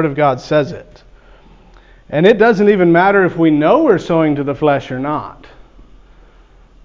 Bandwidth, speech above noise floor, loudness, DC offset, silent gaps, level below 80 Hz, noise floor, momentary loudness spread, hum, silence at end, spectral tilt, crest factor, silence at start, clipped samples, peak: 7.6 kHz; 32 dB; -13 LUFS; under 0.1%; none; -44 dBFS; -44 dBFS; 12 LU; none; 1.5 s; -7.5 dB/octave; 14 dB; 0 s; under 0.1%; 0 dBFS